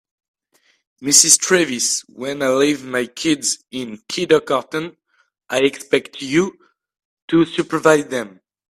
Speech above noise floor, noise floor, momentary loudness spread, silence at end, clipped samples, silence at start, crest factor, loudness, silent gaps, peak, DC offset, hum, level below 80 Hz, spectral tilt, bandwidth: 44 dB; -62 dBFS; 15 LU; 0.5 s; under 0.1%; 1 s; 20 dB; -17 LUFS; 7.05-7.28 s; 0 dBFS; under 0.1%; none; -62 dBFS; -2.5 dB/octave; 16 kHz